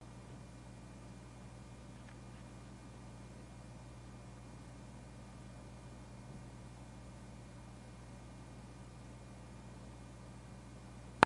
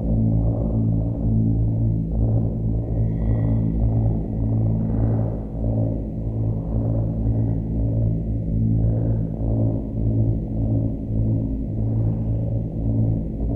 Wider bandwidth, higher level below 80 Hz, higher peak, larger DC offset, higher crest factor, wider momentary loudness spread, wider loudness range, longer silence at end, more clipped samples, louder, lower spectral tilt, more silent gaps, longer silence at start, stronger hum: first, 11.5 kHz vs 2.1 kHz; second, -58 dBFS vs -28 dBFS; first, -2 dBFS vs -8 dBFS; neither; first, 44 dB vs 12 dB; second, 1 LU vs 4 LU; about the same, 0 LU vs 2 LU; about the same, 0 s vs 0 s; neither; second, -54 LUFS vs -23 LUFS; second, -5 dB/octave vs -13.5 dB/octave; neither; about the same, 0 s vs 0 s; first, 60 Hz at -55 dBFS vs none